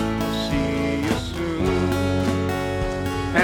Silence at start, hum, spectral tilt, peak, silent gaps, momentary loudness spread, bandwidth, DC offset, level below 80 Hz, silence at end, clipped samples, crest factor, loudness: 0 s; none; -6 dB/octave; -4 dBFS; none; 4 LU; 19 kHz; under 0.1%; -36 dBFS; 0 s; under 0.1%; 18 dB; -23 LUFS